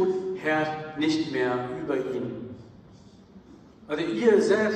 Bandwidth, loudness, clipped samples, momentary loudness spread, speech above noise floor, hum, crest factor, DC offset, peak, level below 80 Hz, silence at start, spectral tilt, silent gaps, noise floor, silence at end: 9.4 kHz; -26 LUFS; under 0.1%; 14 LU; 26 dB; none; 18 dB; under 0.1%; -8 dBFS; -64 dBFS; 0 s; -5.5 dB/octave; none; -51 dBFS; 0 s